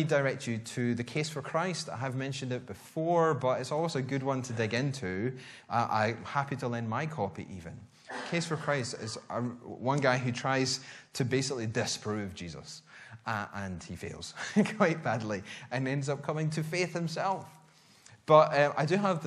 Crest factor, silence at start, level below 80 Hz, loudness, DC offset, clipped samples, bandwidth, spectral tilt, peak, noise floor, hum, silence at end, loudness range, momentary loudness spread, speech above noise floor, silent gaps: 24 dB; 0 s; -68 dBFS; -32 LUFS; under 0.1%; under 0.1%; 13.5 kHz; -5.5 dB/octave; -8 dBFS; -59 dBFS; none; 0 s; 4 LU; 14 LU; 28 dB; none